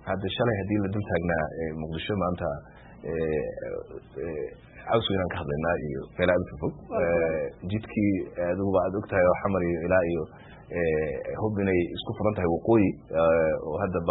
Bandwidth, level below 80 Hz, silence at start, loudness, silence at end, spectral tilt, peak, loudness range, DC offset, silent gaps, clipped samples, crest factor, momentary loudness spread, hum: 4.1 kHz; -48 dBFS; 0 s; -27 LUFS; 0 s; -11 dB/octave; -8 dBFS; 5 LU; under 0.1%; none; under 0.1%; 18 dB; 11 LU; none